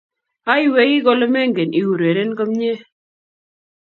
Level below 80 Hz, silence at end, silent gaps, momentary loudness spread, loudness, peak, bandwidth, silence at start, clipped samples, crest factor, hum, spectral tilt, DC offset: -68 dBFS; 1.15 s; none; 8 LU; -16 LUFS; 0 dBFS; 6.4 kHz; 0.45 s; under 0.1%; 18 dB; none; -7.5 dB/octave; under 0.1%